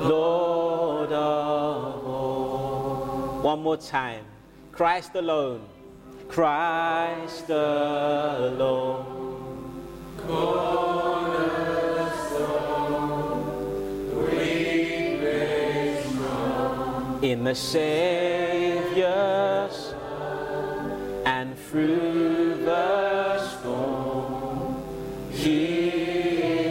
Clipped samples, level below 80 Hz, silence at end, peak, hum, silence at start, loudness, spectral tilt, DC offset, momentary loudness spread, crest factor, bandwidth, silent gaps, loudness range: under 0.1%; -50 dBFS; 0 s; -8 dBFS; none; 0 s; -26 LUFS; -5.5 dB/octave; under 0.1%; 9 LU; 18 dB; 16.5 kHz; none; 3 LU